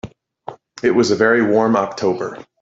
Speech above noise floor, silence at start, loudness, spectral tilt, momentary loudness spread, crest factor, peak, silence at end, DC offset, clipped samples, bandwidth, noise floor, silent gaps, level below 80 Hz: 21 dB; 0.05 s; -16 LUFS; -5.5 dB/octave; 22 LU; 16 dB; -2 dBFS; 0.2 s; under 0.1%; under 0.1%; 8 kHz; -37 dBFS; none; -56 dBFS